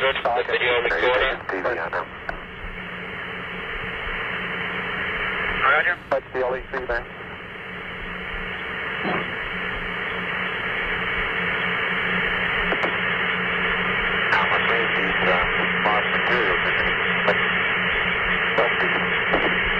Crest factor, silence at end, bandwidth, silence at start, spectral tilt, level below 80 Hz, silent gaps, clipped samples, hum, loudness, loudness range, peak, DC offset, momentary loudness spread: 16 dB; 0 s; 14 kHz; 0 s; -5.5 dB/octave; -42 dBFS; none; under 0.1%; none; -22 LUFS; 8 LU; -6 dBFS; under 0.1%; 11 LU